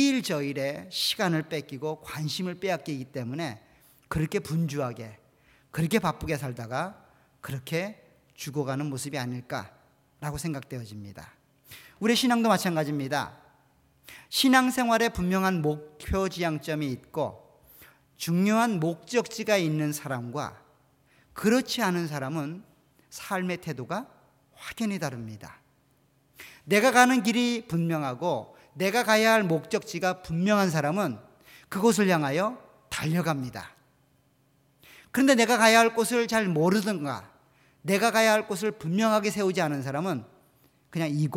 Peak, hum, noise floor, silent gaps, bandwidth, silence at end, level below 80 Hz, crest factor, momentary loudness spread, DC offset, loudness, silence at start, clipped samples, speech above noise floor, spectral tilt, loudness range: -4 dBFS; none; -66 dBFS; none; 19 kHz; 0 s; -54 dBFS; 24 dB; 17 LU; under 0.1%; -27 LUFS; 0 s; under 0.1%; 39 dB; -4.5 dB/octave; 10 LU